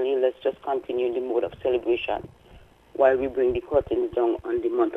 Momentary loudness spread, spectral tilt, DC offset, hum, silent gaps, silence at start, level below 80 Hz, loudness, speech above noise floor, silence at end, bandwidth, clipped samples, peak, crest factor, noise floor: 8 LU; -7.5 dB/octave; under 0.1%; none; none; 0 s; -52 dBFS; -25 LUFS; 27 dB; 0 s; 3.9 kHz; under 0.1%; -6 dBFS; 18 dB; -51 dBFS